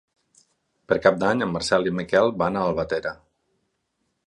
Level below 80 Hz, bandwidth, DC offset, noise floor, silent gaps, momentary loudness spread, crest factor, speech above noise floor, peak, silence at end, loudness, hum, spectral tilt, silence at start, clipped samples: -54 dBFS; 11.5 kHz; under 0.1%; -75 dBFS; none; 7 LU; 22 dB; 53 dB; -2 dBFS; 1.15 s; -23 LUFS; none; -5.5 dB/octave; 0.9 s; under 0.1%